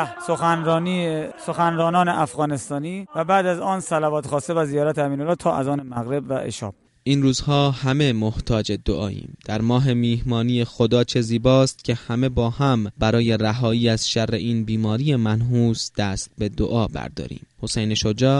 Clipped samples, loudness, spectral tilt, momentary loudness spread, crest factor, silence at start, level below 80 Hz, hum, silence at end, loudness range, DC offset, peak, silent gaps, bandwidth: under 0.1%; -21 LUFS; -6 dB/octave; 8 LU; 16 dB; 0 s; -42 dBFS; none; 0 s; 3 LU; under 0.1%; -4 dBFS; none; 11.5 kHz